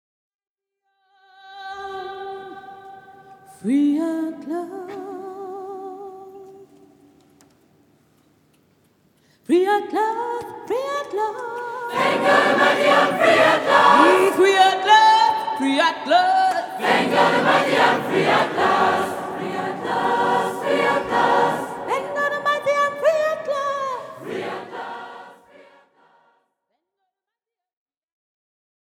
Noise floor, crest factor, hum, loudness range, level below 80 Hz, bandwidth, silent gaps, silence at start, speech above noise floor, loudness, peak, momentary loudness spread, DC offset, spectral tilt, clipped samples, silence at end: -87 dBFS; 20 dB; none; 20 LU; -68 dBFS; 18 kHz; none; 1.45 s; 67 dB; -19 LUFS; 0 dBFS; 19 LU; under 0.1%; -4 dB/octave; under 0.1%; 3.65 s